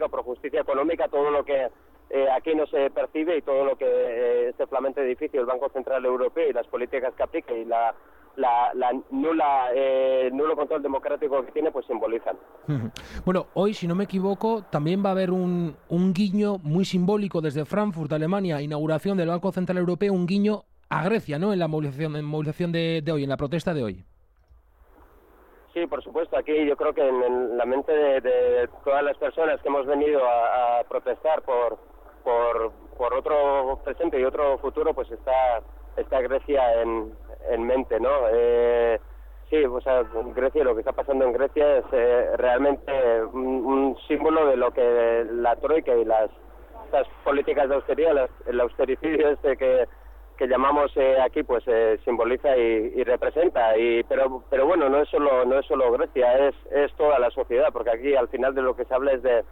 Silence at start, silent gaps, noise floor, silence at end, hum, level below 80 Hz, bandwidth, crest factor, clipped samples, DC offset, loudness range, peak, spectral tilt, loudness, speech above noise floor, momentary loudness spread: 0 s; none; -57 dBFS; 0.05 s; none; -48 dBFS; 9.8 kHz; 12 dB; under 0.1%; under 0.1%; 5 LU; -10 dBFS; -7.5 dB/octave; -24 LUFS; 34 dB; 8 LU